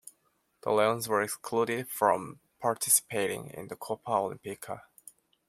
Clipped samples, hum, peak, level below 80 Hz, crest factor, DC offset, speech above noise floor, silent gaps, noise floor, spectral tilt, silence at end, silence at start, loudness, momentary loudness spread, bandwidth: under 0.1%; none; -10 dBFS; -74 dBFS; 22 dB; under 0.1%; 43 dB; none; -73 dBFS; -3 dB/octave; 0.7 s; 0.05 s; -29 LUFS; 17 LU; 16.5 kHz